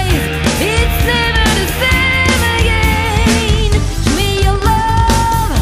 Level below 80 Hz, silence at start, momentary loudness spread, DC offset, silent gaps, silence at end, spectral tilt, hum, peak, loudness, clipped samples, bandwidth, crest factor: -18 dBFS; 0 s; 3 LU; under 0.1%; none; 0 s; -4.5 dB/octave; none; 0 dBFS; -12 LUFS; under 0.1%; 16 kHz; 12 dB